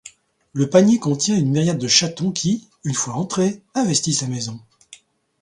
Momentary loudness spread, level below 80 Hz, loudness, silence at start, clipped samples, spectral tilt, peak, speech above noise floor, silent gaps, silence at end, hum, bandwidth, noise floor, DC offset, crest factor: 10 LU; -58 dBFS; -19 LUFS; 0.05 s; under 0.1%; -4.5 dB/octave; 0 dBFS; 30 dB; none; 0.45 s; none; 11.5 kHz; -49 dBFS; under 0.1%; 20 dB